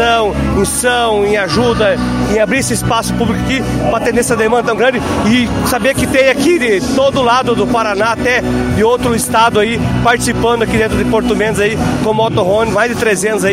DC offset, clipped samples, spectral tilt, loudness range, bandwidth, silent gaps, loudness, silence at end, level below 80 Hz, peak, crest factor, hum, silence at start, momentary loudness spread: under 0.1%; under 0.1%; -4.5 dB/octave; 1 LU; 16 kHz; none; -12 LUFS; 0 s; -30 dBFS; 0 dBFS; 12 dB; none; 0 s; 3 LU